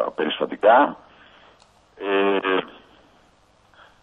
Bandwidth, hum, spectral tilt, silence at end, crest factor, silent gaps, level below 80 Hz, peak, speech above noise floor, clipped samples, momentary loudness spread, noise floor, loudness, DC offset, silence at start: 7.6 kHz; none; -6 dB/octave; 1.3 s; 20 dB; none; -66 dBFS; -4 dBFS; 38 dB; under 0.1%; 18 LU; -58 dBFS; -20 LUFS; under 0.1%; 0 s